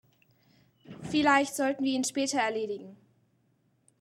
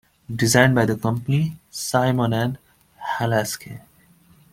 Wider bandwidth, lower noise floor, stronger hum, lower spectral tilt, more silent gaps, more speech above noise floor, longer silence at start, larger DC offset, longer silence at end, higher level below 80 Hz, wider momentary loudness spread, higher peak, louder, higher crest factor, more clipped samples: about the same, 15.5 kHz vs 16.5 kHz; first, -71 dBFS vs -54 dBFS; neither; second, -3 dB/octave vs -5 dB/octave; neither; first, 43 dB vs 34 dB; first, 0.9 s vs 0.3 s; neither; first, 1.05 s vs 0.75 s; second, -68 dBFS vs -54 dBFS; second, 13 LU vs 18 LU; second, -10 dBFS vs -2 dBFS; second, -28 LUFS vs -21 LUFS; about the same, 22 dB vs 20 dB; neither